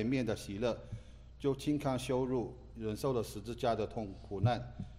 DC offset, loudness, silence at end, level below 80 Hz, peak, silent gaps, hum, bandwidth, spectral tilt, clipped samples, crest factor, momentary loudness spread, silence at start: under 0.1%; -37 LUFS; 0 s; -54 dBFS; -20 dBFS; none; none; 16 kHz; -6.5 dB/octave; under 0.1%; 16 dB; 9 LU; 0 s